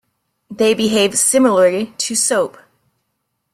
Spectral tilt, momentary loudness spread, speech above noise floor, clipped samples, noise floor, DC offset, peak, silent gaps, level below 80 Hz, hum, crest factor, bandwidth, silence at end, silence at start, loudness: -2.5 dB/octave; 7 LU; 57 dB; under 0.1%; -72 dBFS; under 0.1%; -2 dBFS; none; -60 dBFS; none; 16 dB; 16 kHz; 1.05 s; 0.5 s; -15 LUFS